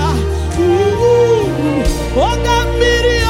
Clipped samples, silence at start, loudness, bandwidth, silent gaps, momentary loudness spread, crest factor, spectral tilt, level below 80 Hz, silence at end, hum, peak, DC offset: under 0.1%; 0 s; -13 LUFS; 16.5 kHz; none; 5 LU; 12 dB; -5.5 dB/octave; -20 dBFS; 0 s; none; -2 dBFS; under 0.1%